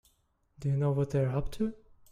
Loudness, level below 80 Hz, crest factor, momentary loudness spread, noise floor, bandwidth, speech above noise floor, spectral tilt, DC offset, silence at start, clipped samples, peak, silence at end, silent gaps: -32 LUFS; -48 dBFS; 14 dB; 7 LU; -72 dBFS; 11.5 kHz; 42 dB; -9 dB/octave; under 0.1%; 0.6 s; under 0.1%; -18 dBFS; 0.35 s; none